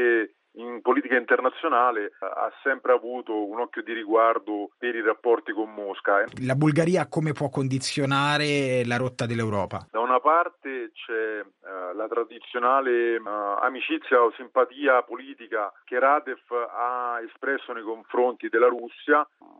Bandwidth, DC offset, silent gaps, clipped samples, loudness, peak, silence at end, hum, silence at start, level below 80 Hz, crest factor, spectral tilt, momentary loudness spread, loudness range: 11.5 kHz; under 0.1%; none; under 0.1%; -25 LUFS; -8 dBFS; 0.35 s; none; 0 s; -70 dBFS; 18 dB; -6 dB/octave; 10 LU; 3 LU